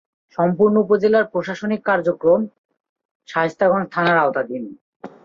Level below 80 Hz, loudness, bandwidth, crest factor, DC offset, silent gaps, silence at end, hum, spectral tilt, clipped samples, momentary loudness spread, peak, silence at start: -62 dBFS; -18 LUFS; 7.4 kHz; 16 dB; under 0.1%; 2.58-2.69 s, 2.80-2.96 s, 3.05-3.20 s, 4.81-5.00 s; 0.15 s; none; -7.5 dB/octave; under 0.1%; 12 LU; -4 dBFS; 0.4 s